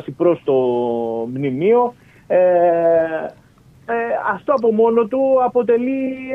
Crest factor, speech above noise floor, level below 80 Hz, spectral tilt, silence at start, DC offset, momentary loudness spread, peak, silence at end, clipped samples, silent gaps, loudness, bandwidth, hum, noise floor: 14 dB; 32 dB; -58 dBFS; -9 dB/octave; 0 s; under 0.1%; 8 LU; -2 dBFS; 0 s; under 0.1%; none; -17 LUFS; 5.6 kHz; none; -48 dBFS